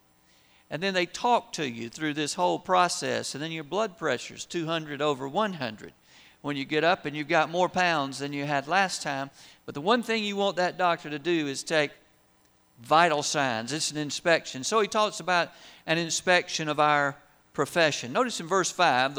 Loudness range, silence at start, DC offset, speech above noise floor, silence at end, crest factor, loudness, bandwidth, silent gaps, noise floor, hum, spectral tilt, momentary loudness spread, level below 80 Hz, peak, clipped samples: 3 LU; 0.7 s; under 0.1%; 36 dB; 0 s; 20 dB; -27 LUFS; over 20 kHz; none; -63 dBFS; none; -3.5 dB/octave; 10 LU; -70 dBFS; -6 dBFS; under 0.1%